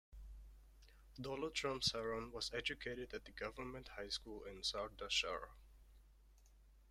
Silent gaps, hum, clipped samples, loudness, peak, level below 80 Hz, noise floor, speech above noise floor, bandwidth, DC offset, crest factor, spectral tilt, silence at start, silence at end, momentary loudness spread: none; none; under 0.1%; -44 LUFS; -24 dBFS; -62 dBFS; -67 dBFS; 22 dB; 16 kHz; under 0.1%; 24 dB; -2.5 dB/octave; 0.1 s; 0 s; 19 LU